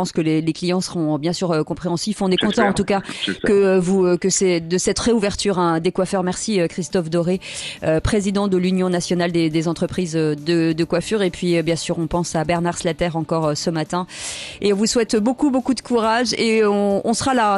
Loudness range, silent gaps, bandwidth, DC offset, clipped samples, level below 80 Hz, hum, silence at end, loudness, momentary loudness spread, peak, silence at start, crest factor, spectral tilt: 3 LU; none; 12 kHz; under 0.1%; under 0.1%; -44 dBFS; none; 0 s; -19 LUFS; 6 LU; -4 dBFS; 0 s; 16 dB; -5 dB/octave